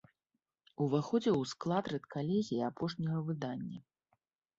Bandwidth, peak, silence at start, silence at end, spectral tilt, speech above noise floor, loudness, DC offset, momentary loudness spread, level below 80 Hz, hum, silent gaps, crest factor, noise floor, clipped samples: 7.8 kHz; -18 dBFS; 0.8 s; 0.75 s; -7 dB/octave; 52 dB; -36 LUFS; under 0.1%; 11 LU; -72 dBFS; none; none; 18 dB; -87 dBFS; under 0.1%